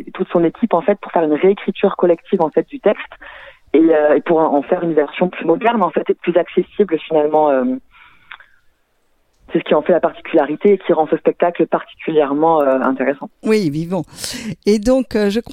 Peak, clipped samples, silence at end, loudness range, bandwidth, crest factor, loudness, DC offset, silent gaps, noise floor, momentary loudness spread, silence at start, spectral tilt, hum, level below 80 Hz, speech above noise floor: -2 dBFS; under 0.1%; 0 s; 3 LU; 15.5 kHz; 14 dB; -16 LUFS; under 0.1%; none; -61 dBFS; 8 LU; 0 s; -6.5 dB/octave; none; -50 dBFS; 45 dB